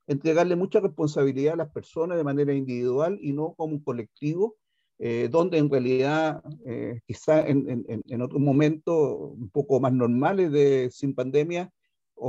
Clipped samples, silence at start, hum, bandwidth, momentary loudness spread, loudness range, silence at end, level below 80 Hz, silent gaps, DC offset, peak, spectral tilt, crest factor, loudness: under 0.1%; 0.1 s; none; 8 kHz; 11 LU; 4 LU; 0 s; -68 dBFS; none; under 0.1%; -10 dBFS; -8 dB/octave; 16 dB; -25 LUFS